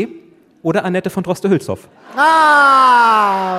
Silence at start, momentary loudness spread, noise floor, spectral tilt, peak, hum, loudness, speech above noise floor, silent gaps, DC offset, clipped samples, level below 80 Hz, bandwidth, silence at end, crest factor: 0 s; 17 LU; -43 dBFS; -5 dB/octave; -2 dBFS; none; -12 LUFS; 30 dB; none; under 0.1%; under 0.1%; -60 dBFS; 15.5 kHz; 0 s; 12 dB